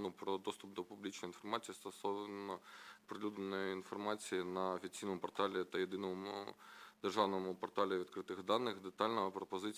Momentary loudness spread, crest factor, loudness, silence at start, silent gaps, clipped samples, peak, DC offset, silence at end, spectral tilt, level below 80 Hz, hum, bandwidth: 11 LU; 22 dB; -42 LUFS; 0 s; none; under 0.1%; -20 dBFS; under 0.1%; 0 s; -4.5 dB/octave; -80 dBFS; none; 16 kHz